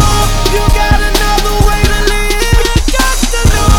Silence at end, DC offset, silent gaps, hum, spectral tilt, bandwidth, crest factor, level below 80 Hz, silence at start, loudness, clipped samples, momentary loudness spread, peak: 0 s; under 0.1%; none; none; -4 dB/octave; 18 kHz; 8 dB; -12 dBFS; 0 s; -11 LUFS; 1%; 1 LU; 0 dBFS